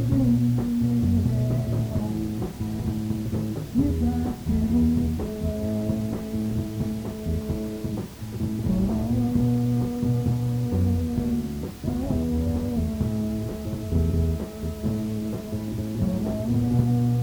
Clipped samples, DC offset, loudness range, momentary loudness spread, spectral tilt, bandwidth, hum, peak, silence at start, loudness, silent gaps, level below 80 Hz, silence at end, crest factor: under 0.1%; under 0.1%; 3 LU; 8 LU; -8.5 dB/octave; over 20 kHz; none; -8 dBFS; 0 s; -26 LUFS; none; -36 dBFS; 0 s; 16 dB